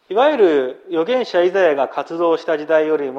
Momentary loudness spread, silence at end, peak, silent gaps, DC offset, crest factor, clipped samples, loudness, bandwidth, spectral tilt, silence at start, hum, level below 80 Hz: 7 LU; 0 s; -2 dBFS; none; under 0.1%; 14 dB; under 0.1%; -17 LUFS; 7.6 kHz; -5.5 dB/octave; 0.1 s; none; -72 dBFS